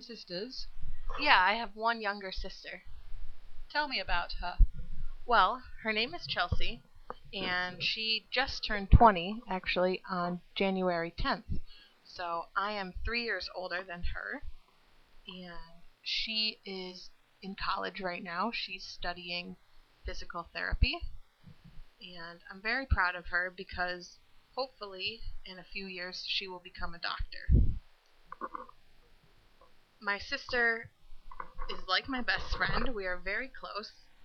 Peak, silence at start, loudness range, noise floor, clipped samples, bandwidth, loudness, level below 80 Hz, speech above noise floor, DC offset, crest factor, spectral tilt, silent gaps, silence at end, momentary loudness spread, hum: -6 dBFS; 0 s; 9 LU; -63 dBFS; under 0.1%; 6.6 kHz; -33 LUFS; -40 dBFS; 30 dB; under 0.1%; 26 dB; -5.5 dB/octave; none; 0 s; 18 LU; none